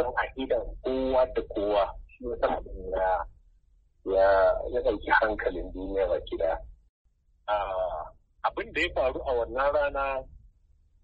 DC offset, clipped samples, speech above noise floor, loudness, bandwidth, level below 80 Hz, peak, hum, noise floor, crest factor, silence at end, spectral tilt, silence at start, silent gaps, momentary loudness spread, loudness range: under 0.1%; under 0.1%; 35 dB; -28 LUFS; 8 kHz; -44 dBFS; -10 dBFS; none; -63 dBFS; 18 dB; 0.65 s; -6.5 dB/octave; 0 s; 6.89-7.05 s; 12 LU; 5 LU